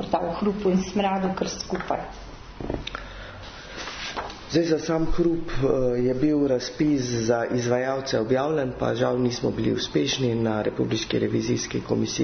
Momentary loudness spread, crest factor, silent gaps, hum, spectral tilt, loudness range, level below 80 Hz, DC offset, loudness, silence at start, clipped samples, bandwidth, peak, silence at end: 12 LU; 16 dB; none; none; -5.5 dB/octave; 6 LU; -42 dBFS; under 0.1%; -25 LUFS; 0 s; under 0.1%; 6.6 kHz; -8 dBFS; 0 s